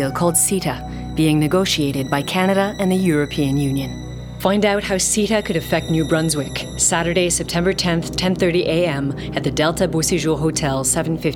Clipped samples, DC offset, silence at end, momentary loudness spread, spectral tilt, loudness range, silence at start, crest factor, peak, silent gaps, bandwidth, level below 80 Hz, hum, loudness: under 0.1%; under 0.1%; 0 s; 6 LU; -4 dB/octave; 1 LU; 0 s; 16 dB; -4 dBFS; none; 19 kHz; -38 dBFS; none; -18 LUFS